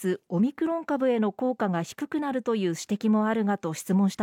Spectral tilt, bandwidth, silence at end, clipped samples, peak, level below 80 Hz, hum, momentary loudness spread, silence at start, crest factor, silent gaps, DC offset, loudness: -6.5 dB/octave; 16.5 kHz; 0 s; under 0.1%; -14 dBFS; -74 dBFS; none; 5 LU; 0 s; 12 dB; none; under 0.1%; -27 LUFS